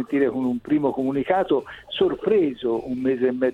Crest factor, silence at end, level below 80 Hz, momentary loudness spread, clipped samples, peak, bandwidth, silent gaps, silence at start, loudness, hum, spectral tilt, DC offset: 16 dB; 0 s; -56 dBFS; 5 LU; under 0.1%; -6 dBFS; 5.2 kHz; none; 0 s; -23 LUFS; none; -7.5 dB/octave; under 0.1%